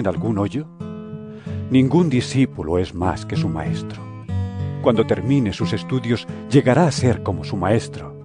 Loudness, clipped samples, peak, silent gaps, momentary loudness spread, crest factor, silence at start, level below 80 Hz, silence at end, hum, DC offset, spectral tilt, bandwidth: -20 LUFS; under 0.1%; -2 dBFS; none; 16 LU; 18 dB; 0 s; -44 dBFS; 0 s; none; under 0.1%; -7 dB/octave; 10 kHz